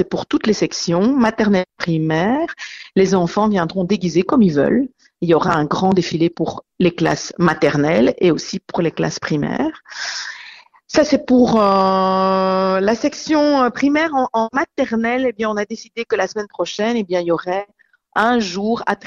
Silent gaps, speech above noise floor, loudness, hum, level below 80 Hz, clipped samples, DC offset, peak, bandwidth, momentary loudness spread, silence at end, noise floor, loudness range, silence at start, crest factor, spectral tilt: none; 25 dB; -17 LUFS; none; -50 dBFS; under 0.1%; under 0.1%; -2 dBFS; 7.8 kHz; 10 LU; 0.1 s; -41 dBFS; 4 LU; 0 s; 14 dB; -5.5 dB/octave